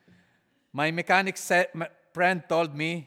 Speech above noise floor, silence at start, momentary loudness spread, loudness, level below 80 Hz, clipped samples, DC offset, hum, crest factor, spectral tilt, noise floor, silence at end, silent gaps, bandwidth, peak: 42 dB; 0.75 s; 12 LU; -26 LUFS; -78 dBFS; under 0.1%; under 0.1%; none; 20 dB; -4.5 dB/octave; -68 dBFS; 0 s; none; 17 kHz; -8 dBFS